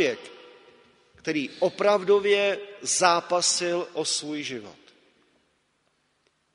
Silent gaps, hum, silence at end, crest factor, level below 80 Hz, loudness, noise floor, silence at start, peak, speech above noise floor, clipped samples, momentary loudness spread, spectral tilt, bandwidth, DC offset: none; none; 1.8 s; 24 dB; -74 dBFS; -24 LUFS; -70 dBFS; 0 s; -4 dBFS; 46 dB; under 0.1%; 14 LU; -2 dB/octave; 10.5 kHz; under 0.1%